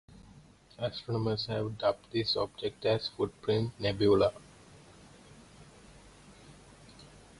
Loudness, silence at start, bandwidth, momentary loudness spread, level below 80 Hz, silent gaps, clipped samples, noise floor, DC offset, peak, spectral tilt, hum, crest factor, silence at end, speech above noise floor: -31 LUFS; 0.1 s; 11.5 kHz; 12 LU; -58 dBFS; none; under 0.1%; -57 dBFS; under 0.1%; -14 dBFS; -6.5 dB/octave; none; 20 dB; 0.35 s; 26 dB